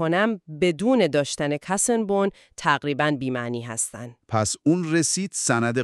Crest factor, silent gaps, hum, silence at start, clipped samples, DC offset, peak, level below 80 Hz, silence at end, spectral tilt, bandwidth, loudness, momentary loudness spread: 18 dB; none; none; 0 s; under 0.1%; under 0.1%; -4 dBFS; -60 dBFS; 0 s; -4 dB/octave; 13.5 kHz; -23 LUFS; 7 LU